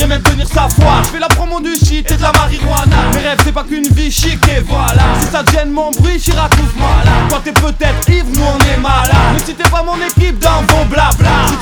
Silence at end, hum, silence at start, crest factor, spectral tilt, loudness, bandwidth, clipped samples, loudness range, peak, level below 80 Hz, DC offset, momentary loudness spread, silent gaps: 0 s; none; 0 s; 10 dB; -4.5 dB/octave; -11 LUFS; over 20 kHz; 0.1%; 1 LU; 0 dBFS; -14 dBFS; under 0.1%; 3 LU; none